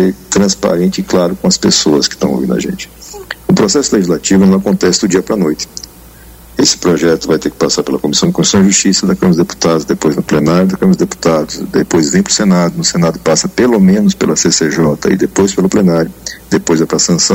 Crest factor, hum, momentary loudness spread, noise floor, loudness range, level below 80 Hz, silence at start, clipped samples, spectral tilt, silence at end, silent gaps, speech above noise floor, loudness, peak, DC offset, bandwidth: 10 dB; none; 7 LU; -36 dBFS; 2 LU; -40 dBFS; 0 s; under 0.1%; -4.5 dB/octave; 0 s; none; 25 dB; -11 LUFS; 0 dBFS; under 0.1%; 16.5 kHz